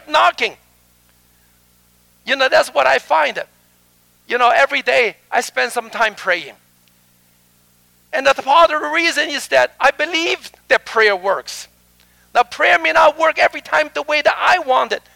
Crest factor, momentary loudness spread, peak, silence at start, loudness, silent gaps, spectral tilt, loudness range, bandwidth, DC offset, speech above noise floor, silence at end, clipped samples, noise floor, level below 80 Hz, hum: 16 dB; 9 LU; -2 dBFS; 0.1 s; -15 LUFS; none; -1 dB/octave; 4 LU; 18 kHz; under 0.1%; 40 dB; 0.2 s; under 0.1%; -55 dBFS; -56 dBFS; 60 Hz at -60 dBFS